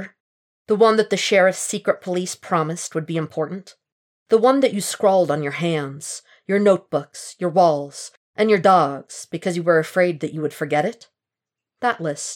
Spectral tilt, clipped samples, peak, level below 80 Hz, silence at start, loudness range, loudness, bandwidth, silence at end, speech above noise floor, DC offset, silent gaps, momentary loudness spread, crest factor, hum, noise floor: -4.5 dB/octave; under 0.1%; -4 dBFS; -80 dBFS; 0 s; 3 LU; -20 LUFS; 17 kHz; 0 s; 67 dB; under 0.1%; 0.20-0.65 s, 3.92-4.26 s, 8.17-8.33 s; 14 LU; 16 dB; none; -87 dBFS